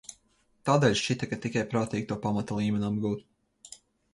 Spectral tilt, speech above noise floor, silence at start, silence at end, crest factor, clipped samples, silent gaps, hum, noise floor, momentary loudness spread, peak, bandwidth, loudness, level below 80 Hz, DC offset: -5.5 dB/octave; 40 dB; 0.1 s; 0.4 s; 20 dB; under 0.1%; none; none; -68 dBFS; 24 LU; -10 dBFS; 11.5 kHz; -29 LUFS; -58 dBFS; under 0.1%